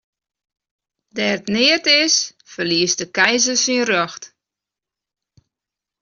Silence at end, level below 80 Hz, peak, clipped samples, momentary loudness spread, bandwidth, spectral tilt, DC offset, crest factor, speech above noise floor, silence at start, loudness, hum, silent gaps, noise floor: 1.75 s; -64 dBFS; -2 dBFS; under 0.1%; 13 LU; 7.4 kHz; -1 dB/octave; under 0.1%; 18 dB; 69 dB; 1.15 s; -16 LUFS; none; none; -86 dBFS